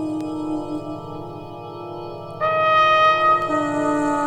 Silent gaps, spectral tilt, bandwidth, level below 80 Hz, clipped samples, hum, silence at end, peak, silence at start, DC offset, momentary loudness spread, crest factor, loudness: none; -5 dB/octave; 10.5 kHz; -52 dBFS; under 0.1%; 50 Hz at -55 dBFS; 0 s; -6 dBFS; 0 s; under 0.1%; 19 LU; 16 dB; -19 LUFS